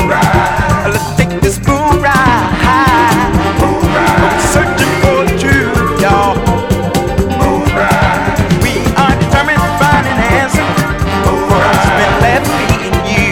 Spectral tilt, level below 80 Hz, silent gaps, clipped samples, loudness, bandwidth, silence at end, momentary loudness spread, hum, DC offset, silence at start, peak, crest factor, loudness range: -5.5 dB/octave; -22 dBFS; none; under 0.1%; -10 LUFS; 19 kHz; 0 s; 4 LU; none; under 0.1%; 0 s; 0 dBFS; 10 dB; 1 LU